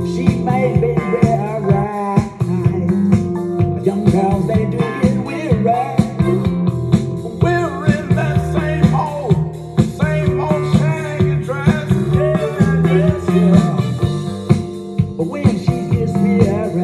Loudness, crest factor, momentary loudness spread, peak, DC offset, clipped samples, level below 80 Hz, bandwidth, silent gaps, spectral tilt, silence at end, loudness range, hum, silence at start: -16 LUFS; 16 dB; 4 LU; 0 dBFS; under 0.1%; under 0.1%; -36 dBFS; 12.5 kHz; none; -8.5 dB/octave; 0 s; 2 LU; none; 0 s